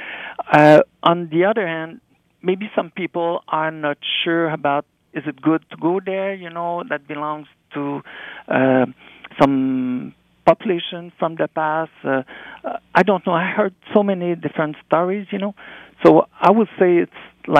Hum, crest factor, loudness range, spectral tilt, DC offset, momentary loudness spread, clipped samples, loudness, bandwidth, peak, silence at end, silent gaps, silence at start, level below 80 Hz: none; 18 dB; 5 LU; -7.5 dB/octave; under 0.1%; 15 LU; under 0.1%; -19 LUFS; 9 kHz; 0 dBFS; 0 s; none; 0 s; -62 dBFS